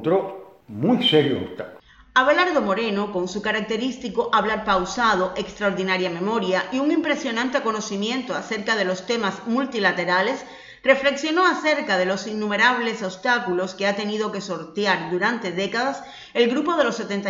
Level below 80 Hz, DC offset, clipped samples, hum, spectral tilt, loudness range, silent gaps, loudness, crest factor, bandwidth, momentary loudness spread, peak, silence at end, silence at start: -56 dBFS; under 0.1%; under 0.1%; none; -4.5 dB/octave; 3 LU; none; -22 LUFS; 20 dB; 8 kHz; 8 LU; -4 dBFS; 0 s; 0 s